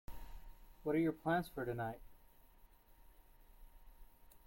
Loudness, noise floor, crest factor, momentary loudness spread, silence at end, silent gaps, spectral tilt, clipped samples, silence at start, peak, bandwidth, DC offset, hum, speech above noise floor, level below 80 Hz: -40 LUFS; -65 dBFS; 18 dB; 21 LU; 0.15 s; none; -7.5 dB/octave; under 0.1%; 0.1 s; -24 dBFS; 16.5 kHz; under 0.1%; none; 26 dB; -60 dBFS